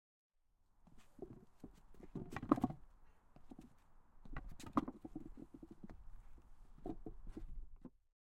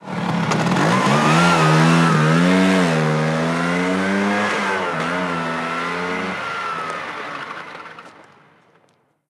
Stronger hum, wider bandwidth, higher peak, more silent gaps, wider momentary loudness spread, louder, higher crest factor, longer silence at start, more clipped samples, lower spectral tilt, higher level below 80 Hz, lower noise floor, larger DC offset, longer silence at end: neither; first, 15.5 kHz vs 12.5 kHz; second, -16 dBFS vs -2 dBFS; neither; first, 25 LU vs 14 LU; second, -46 LUFS vs -18 LUFS; first, 32 dB vs 18 dB; first, 0.75 s vs 0.05 s; neither; first, -7.5 dB/octave vs -5.5 dB/octave; about the same, -58 dBFS vs -58 dBFS; first, -75 dBFS vs -60 dBFS; neither; second, 0.4 s vs 1.05 s